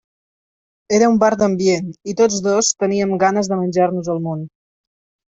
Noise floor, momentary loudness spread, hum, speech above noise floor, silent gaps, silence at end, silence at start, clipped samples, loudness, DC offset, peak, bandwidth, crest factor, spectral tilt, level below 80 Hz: under -90 dBFS; 9 LU; none; over 74 dB; none; 0.9 s; 0.9 s; under 0.1%; -17 LUFS; under 0.1%; -2 dBFS; 8.2 kHz; 16 dB; -4.5 dB/octave; -58 dBFS